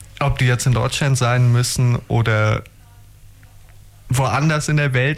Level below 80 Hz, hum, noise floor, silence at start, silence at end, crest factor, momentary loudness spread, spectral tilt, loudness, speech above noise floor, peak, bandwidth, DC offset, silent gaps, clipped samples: -38 dBFS; none; -44 dBFS; 0 s; 0 s; 12 dB; 5 LU; -5 dB/octave; -18 LUFS; 28 dB; -8 dBFS; 15 kHz; under 0.1%; none; under 0.1%